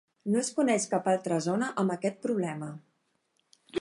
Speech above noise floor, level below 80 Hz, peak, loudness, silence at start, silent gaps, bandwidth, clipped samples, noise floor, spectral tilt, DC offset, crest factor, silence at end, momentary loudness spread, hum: 46 dB; -80 dBFS; -14 dBFS; -29 LUFS; 0.25 s; none; 11.5 kHz; under 0.1%; -75 dBFS; -5 dB/octave; under 0.1%; 18 dB; 0 s; 12 LU; none